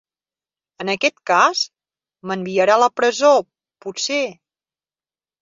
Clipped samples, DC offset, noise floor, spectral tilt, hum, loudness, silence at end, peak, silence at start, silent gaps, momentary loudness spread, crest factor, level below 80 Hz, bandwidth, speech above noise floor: under 0.1%; under 0.1%; under -90 dBFS; -3 dB/octave; none; -18 LUFS; 1.1 s; -2 dBFS; 0.8 s; none; 14 LU; 18 dB; -70 dBFS; 7.8 kHz; over 73 dB